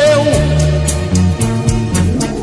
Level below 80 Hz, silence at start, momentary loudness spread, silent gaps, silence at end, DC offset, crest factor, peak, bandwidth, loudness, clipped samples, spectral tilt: -24 dBFS; 0 s; 4 LU; none; 0 s; under 0.1%; 12 dB; 0 dBFS; 12 kHz; -13 LUFS; under 0.1%; -5.5 dB/octave